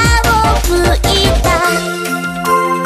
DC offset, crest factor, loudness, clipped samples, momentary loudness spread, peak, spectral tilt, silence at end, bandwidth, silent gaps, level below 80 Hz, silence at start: under 0.1%; 12 dB; -12 LUFS; under 0.1%; 7 LU; 0 dBFS; -4 dB/octave; 0 s; 15.5 kHz; none; -18 dBFS; 0 s